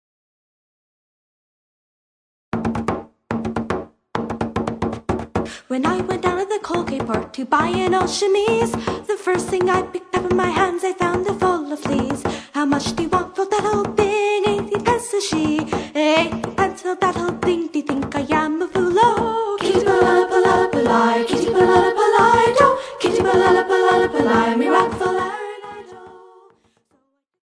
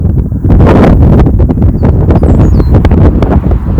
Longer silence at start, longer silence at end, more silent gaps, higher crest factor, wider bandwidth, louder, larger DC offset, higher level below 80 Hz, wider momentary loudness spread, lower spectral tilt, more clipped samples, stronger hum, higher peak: first, 2.5 s vs 0 s; first, 1.3 s vs 0 s; neither; first, 18 dB vs 4 dB; first, 11 kHz vs 6.8 kHz; second, -19 LUFS vs -6 LUFS; neither; second, -46 dBFS vs -10 dBFS; first, 10 LU vs 5 LU; second, -5 dB/octave vs -10 dB/octave; second, under 0.1% vs 9%; neither; about the same, 0 dBFS vs 0 dBFS